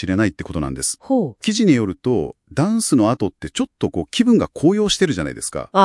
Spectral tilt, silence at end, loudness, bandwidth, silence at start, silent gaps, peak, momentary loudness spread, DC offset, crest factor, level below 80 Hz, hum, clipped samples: -5 dB/octave; 0 s; -19 LUFS; 12 kHz; 0 s; none; 0 dBFS; 9 LU; under 0.1%; 18 dB; -44 dBFS; none; under 0.1%